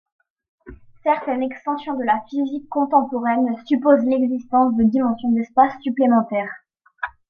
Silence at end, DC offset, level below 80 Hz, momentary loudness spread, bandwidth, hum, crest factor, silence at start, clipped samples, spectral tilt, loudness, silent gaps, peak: 0.2 s; under 0.1%; -54 dBFS; 9 LU; 5.2 kHz; none; 18 dB; 0.65 s; under 0.1%; -8.5 dB/octave; -20 LUFS; none; -2 dBFS